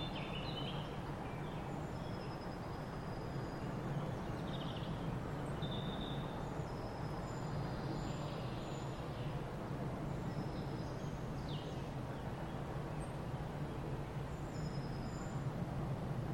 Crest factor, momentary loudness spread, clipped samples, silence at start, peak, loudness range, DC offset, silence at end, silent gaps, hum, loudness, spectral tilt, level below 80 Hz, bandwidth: 14 dB; 3 LU; under 0.1%; 0 s; -30 dBFS; 2 LU; under 0.1%; 0 s; none; none; -43 LUFS; -6.5 dB/octave; -54 dBFS; 16.5 kHz